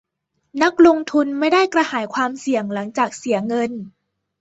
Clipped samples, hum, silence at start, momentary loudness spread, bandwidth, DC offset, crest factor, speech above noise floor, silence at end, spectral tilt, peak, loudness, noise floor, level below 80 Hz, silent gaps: under 0.1%; none; 0.55 s; 11 LU; 8 kHz; under 0.1%; 18 dB; 54 dB; 0.5 s; -4.5 dB/octave; -2 dBFS; -18 LUFS; -72 dBFS; -62 dBFS; none